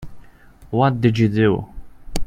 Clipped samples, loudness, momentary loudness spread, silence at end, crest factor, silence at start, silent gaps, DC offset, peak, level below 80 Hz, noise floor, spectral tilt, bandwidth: under 0.1%; -18 LUFS; 14 LU; 0 s; 18 dB; 0 s; none; under 0.1%; -2 dBFS; -36 dBFS; -44 dBFS; -7.5 dB/octave; 15.5 kHz